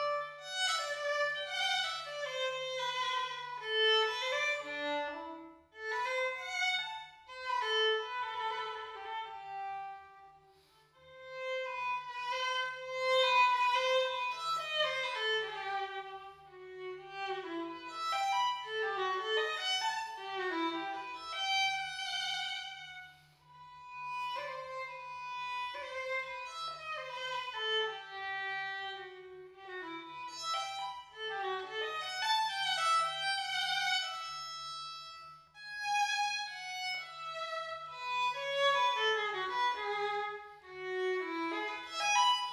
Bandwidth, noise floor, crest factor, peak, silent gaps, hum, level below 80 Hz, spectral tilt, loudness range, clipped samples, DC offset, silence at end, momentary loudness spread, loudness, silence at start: 13.5 kHz; -65 dBFS; 18 dB; -18 dBFS; none; none; -78 dBFS; -0.5 dB/octave; 8 LU; under 0.1%; under 0.1%; 0 s; 15 LU; -35 LUFS; 0 s